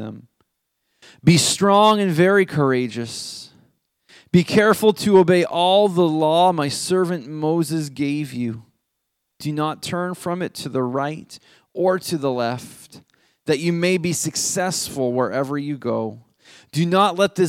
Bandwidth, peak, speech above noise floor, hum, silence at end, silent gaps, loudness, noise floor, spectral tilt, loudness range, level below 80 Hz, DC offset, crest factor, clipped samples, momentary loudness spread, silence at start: 16.5 kHz; -2 dBFS; 57 dB; none; 0 s; none; -19 LUFS; -76 dBFS; -5 dB/octave; 8 LU; -60 dBFS; under 0.1%; 18 dB; under 0.1%; 13 LU; 0 s